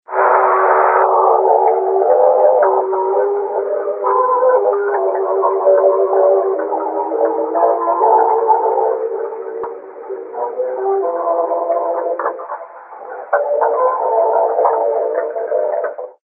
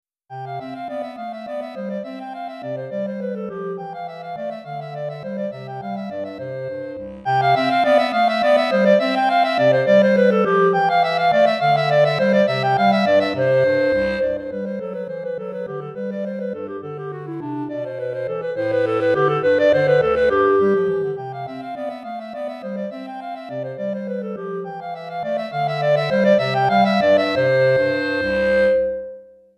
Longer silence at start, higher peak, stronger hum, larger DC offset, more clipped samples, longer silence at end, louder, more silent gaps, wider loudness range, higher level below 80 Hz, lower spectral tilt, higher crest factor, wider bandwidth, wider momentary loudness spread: second, 0.1 s vs 0.3 s; first, 0 dBFS vs -4 dBFS; neither; neither; neither; second, 0.1 s vs 0.35 s; first, -15 LUFS vs -19 LUFS; neither; second, 7 LU vs 13 LU; second, -78 dBFS vs -54 dBFS; first, -9.5 dB/octave vs -7 dB/octave; about the same, 14 dB vs 16 dB; second, 2.8 kHz vs 10.5 kHz; about the same, 13 LU vs 14 LU